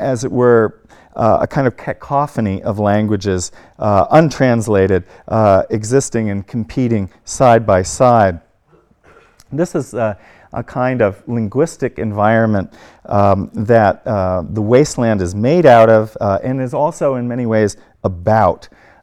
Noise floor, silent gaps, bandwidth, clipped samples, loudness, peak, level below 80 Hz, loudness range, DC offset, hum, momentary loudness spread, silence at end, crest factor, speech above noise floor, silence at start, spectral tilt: -53 dBFS; none; 13 kHz; 0.2%; -15 LUFS; 0 dBFS; -44 dBFS; 5 LU; under 0.1%; none; 10 LU; 0.4 s; 14 dB; 39 dB; 0 s; -6.5 dB/octave